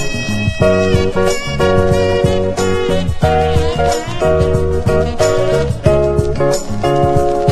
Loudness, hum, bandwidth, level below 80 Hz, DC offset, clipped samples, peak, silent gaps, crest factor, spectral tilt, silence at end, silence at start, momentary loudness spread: -14 LUFS; none; 13.5 kHz; -24 dBFS; under 0.1%; under 0.1%; 0 dBFS; none; 12 dB; -6 dB/octave; 0 s; 0 s; 3 LU